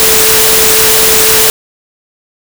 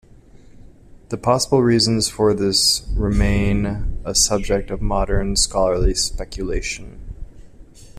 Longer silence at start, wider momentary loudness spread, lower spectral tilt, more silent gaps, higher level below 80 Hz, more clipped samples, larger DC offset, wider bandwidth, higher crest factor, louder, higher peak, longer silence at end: second, 0 s vs 0.55 s; second, 2 LU vs 12 LU; second, -0.5 dB/octave vs -4 dB/octave; neither; second, -34 dBFS vs -28 dBFS; neither; neither; first, over 20 kHz vs 14.5 kHz; second, 8 dB vs 16 dB; first, -4 LUFS vs -19 LUFS; first, 0 dBFS vs -4 dBFS; first, 1 s vs 0 s